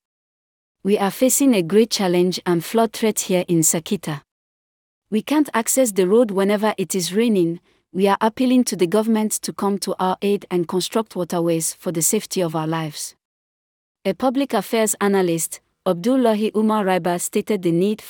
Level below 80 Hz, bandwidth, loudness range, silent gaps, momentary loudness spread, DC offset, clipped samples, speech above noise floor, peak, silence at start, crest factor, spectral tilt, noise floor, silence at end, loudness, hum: -66 dBFS; over 20 kHz; 4 LU; 4.31-5.02 s, 13.25-13.95 s; 8 LU; under 0.1%; under 0.1%; over 71 dB; -4 dBFS; 0.85 s; 16 dB; -4.5 dB/octave; under -90 dBFS; 0 s; -20 LUFS; none